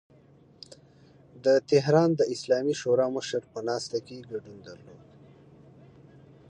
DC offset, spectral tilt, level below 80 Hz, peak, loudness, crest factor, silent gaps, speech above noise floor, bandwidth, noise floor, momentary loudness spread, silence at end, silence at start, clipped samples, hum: under 0.1%; -5.5 dB/octave; -70 dBFS; -8 dBFS; -26 LUFS; 20 dB; none; 30 dB; 10.5 kHz; -57 dBFS; 24 LU; 1.55 s; 0.7 s; under 0.1%; none